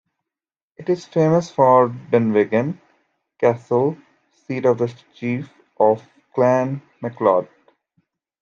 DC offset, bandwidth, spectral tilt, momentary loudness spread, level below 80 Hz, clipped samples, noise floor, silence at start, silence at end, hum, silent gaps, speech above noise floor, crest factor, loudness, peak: under 0.1%; 7.4 kHz; -8 dB/octave; 13 LU; -68 dBFS; under 0.1%; -89 dBFS; 0.8 s; 0.95 s; none; none; 71 dB; 18 dB; -19 LUFS; -2 dBFS